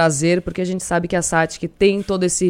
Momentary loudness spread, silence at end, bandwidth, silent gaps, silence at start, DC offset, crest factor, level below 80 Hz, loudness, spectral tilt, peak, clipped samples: 6 LU; 0 s; 16 kHz; none; 0 s; under 0.1%; 16 dB; -42 dBFS; -19 LUFS; -4.5 dB/octave; -2 dBFS; under 0.1%